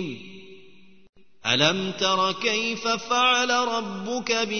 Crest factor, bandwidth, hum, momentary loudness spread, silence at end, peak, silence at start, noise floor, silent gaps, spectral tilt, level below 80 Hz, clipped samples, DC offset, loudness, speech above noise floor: 20 dB; 6.6 kHz; none; 11 LU; 0 s; -4 dBFS; 0 s; -54 dBFS; 1.09-1.13 s; -2.5 dB/octave; -64 dBFS; under 0.1%; 0.4%; -23 LUFS; 29 dB